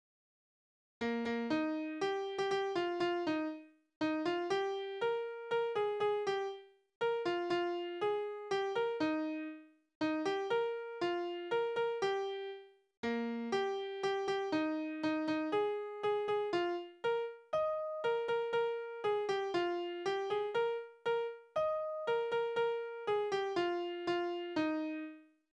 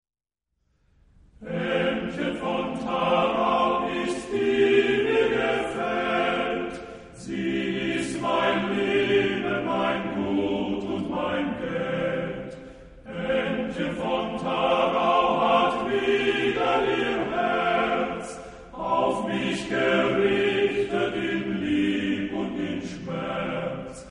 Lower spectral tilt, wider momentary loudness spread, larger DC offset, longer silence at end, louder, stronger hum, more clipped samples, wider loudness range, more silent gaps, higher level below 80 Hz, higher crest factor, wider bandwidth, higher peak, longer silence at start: about the same, -5 dB/octave vs -5.5 dB/octave; second, 5 LU vs 10 LU; neither; first, 0.35 s vs 0 s; second, -37 LUFS vs -25 LUFS; neither; neither; second, 1 LU vs 5 LU; first, 3.96-4.01 s, 6.95-7.01 s, 9.95-10.01 s, 12.97-13.03 s vs none; second, -78 dBFS vs -52 dBFS; about the same, 14 dB vs 18 dB; about the same, 9.8 kHz vs 10.5 kHz; second, -22 dBFS vs -8 dBFS; second, 1 s vs 1.4 s